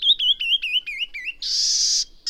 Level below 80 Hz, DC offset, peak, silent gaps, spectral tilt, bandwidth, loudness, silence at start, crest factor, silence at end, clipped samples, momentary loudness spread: -52 dBFS; under 0.1%; -8 dBFS; none; 5.5 dB/octave; over 20 kHz; -19 LUFS; 0 s; 14 dB; 0 s; under 0.1%; 11 LU